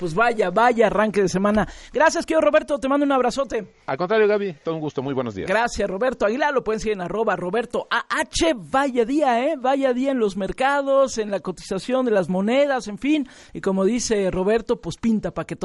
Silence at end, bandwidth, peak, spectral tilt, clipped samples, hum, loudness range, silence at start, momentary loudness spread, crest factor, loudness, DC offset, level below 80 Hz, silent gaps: 0 s; 11.5 kHz; -6 dBFS; -5 dB/octave; under 0.1%; none; 3 LU; 0 s; 8 LU; 16 dB; -21 LUFS; under 0.1%; -46 dBFS; none